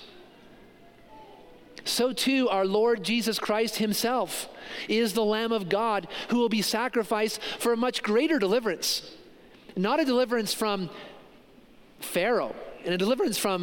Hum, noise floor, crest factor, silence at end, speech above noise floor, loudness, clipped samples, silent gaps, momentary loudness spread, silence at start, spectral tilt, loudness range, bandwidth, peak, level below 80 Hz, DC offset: none; -54 dBFS; 16 dB; 0 s; 28 dB; -27 LUFS; under 0.1%; none; 10 LU; 0 s; -3.5 dB/octave; 3 LU; 17 kHz; -12 dBFS; -64 dBFS; under 0.1%